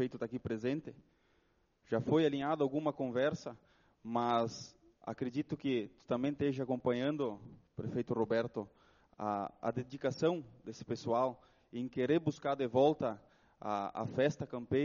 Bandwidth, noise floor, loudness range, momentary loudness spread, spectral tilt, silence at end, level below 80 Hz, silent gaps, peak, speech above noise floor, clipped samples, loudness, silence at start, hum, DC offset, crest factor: 7.2 kHz; -74 dBFS; 3 LU; 16 LU; -6 dB/octave; 0 s; -70 dBFS; none; -18 dBFS; 39 dB; under 0.1%; -36 LUFS; 0 s; none; under 0.1%; 20 dB